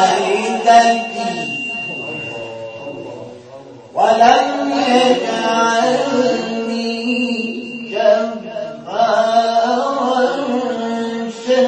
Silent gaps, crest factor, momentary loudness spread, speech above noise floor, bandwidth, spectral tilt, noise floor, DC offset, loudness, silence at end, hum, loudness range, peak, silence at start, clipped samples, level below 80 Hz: none; 16 dB; 16 LU; 24 dB; 8.8 kHz; -3.5 dB/octave; -37 dBFS; under 0.1%; -16 LUFS; 0 s; none; 4 LU; 0 dBFS; 0 s; under 0.1%; -64 dBFS